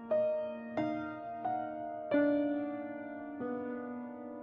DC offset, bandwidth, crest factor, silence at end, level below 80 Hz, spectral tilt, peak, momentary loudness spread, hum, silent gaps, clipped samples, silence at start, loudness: under 0.1%; 5.4 kHz; 16 dB; 0 s; -76 dBFS; -5.5 dB/octave; -20 dBFS; 12 LU; none; none; under 0.1%; 0 s; -36 LUFS